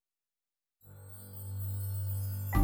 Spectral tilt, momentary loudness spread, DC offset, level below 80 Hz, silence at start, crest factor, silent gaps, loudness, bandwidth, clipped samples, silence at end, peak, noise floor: -6.5 dB/octave; 16 LU; under 0.1%; -48 dBFS; 0.85 s; 20 dB; none; -37 LUFS; over 20 kHz; under 0.1%; 0 s; -16 dBFS; under -90 dBFS